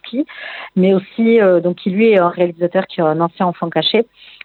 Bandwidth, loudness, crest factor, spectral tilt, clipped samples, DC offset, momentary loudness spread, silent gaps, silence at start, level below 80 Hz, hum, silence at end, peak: 4.5 kHz; -15 LUFS; 14 dB; -9 dB/octave; under 0.1%; under 0.1%; 11 LU; none; 0.05 s; -66 dBFS; none; 0.4 s; 0 dBFS